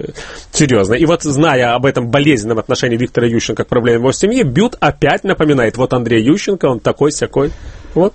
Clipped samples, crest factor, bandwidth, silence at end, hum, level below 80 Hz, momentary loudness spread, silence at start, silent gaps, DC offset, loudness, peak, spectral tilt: under 0.1%; 12 dB; 8.8 kHz; 0.05 s; none; -36 dBFS; 5 LU; 0 s; none; under 0.1%; -13 LUFS; 0 dBFS; -5.5 dB/octave